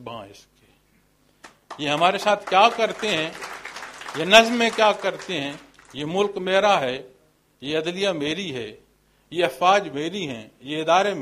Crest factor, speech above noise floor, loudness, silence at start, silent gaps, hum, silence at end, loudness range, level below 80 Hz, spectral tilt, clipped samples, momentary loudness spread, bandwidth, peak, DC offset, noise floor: 24 dB; 40 dB; -21 LUFS; 0 s; none; none; 0 s; 5 LU; -62 dBFS; -3.5 dB/octave; under 0.1%; 18 LU; 15.5 kHz; 0 dBFS; under 0.1%; -62 dBFS